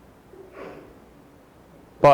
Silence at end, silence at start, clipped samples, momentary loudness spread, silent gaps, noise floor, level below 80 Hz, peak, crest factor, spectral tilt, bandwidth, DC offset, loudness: 0 s; 2 s; under 0.1%; 16 LU; none; -51 dBFS; -54 dBFS; -6 dBFS; 18 dB; -7 dB/octave; 15.5 kHz; under 0.1%; -24 LUFS